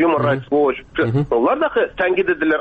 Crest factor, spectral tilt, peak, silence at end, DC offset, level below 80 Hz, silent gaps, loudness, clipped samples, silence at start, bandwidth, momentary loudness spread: 10 dB; -9 dB/octave; -6 dBFS; 0 s; under 0.1%; -46 dBFS; none; -18 LUFS; under 0.1%; 0 s; 5 kHz; 3 LU